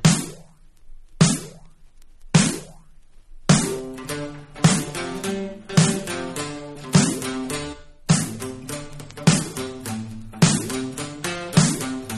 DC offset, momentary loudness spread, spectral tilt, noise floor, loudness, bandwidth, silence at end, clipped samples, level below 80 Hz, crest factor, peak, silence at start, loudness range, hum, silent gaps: under 0.1%; 14 LU; -4.5 dB/octave; -46 dBFS; -22 LUFS; 14 kHz; 0 s; under 0.1%; -46 dBFS; 22 dB; -2 dBFS; 0 s; 2 LU; none; none